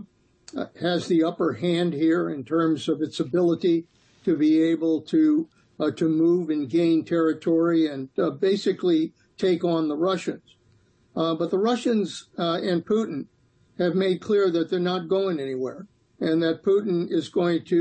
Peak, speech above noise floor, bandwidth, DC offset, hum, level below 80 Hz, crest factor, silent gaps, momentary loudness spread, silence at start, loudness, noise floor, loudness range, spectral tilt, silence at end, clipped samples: -12 dBFS; 38 dB; 8.6 kHz; under 0.1%; none; -70 dBFS; 12 dB; none; 9 LU; 0 s; -24 LUFS; -61 dBFS; 3 LU; -7 dB/octave; 0 s; under 0.1%